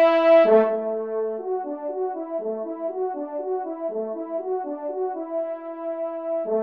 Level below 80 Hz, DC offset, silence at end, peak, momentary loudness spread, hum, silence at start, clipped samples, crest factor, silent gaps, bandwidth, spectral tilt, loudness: -78 dBFS; under 0.1%; 0 s; -6 dBFS; 14 LU; none; 0 s; under 0.1%; 18 dB; none; 5.6 kHz; -7.5 dB/octave; -24 LUFS